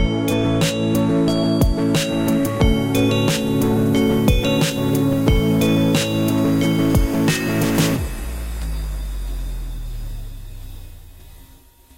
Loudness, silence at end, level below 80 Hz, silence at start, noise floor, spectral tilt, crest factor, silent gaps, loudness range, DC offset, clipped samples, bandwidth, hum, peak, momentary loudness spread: -18 LUFS; 0.55 s; -28 dBFS; 0 s; -47 dBFS; -5.5 dB/octave; 16 dB; none; 13 LU; 0.4%; under 0.1%; 17 kHz; none; -2 dBFS; 15 LU